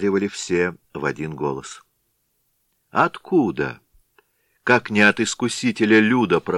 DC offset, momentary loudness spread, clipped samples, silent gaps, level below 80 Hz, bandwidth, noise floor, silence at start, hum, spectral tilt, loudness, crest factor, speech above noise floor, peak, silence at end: under 0.1%; 12 LU; under 0.1%; none; -58 dBFS; 12 kHz; -69 dBFS; 0 s; none; -5 dB/octave; -20 LUFS; 20 dB; 50 dB; 0 dBFS; 0 s